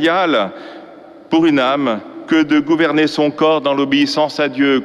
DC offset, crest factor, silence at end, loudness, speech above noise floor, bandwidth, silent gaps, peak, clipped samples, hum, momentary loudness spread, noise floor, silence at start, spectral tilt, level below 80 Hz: under 0.1%; 12 dB; 0 s; -15 LUFS; 24 dB; 11 kHz; none; -2 dBFS; under 0.1%; none; 7 LU; -38 dBFS; 0 s; -5.5 dB/octave; -58 dBFS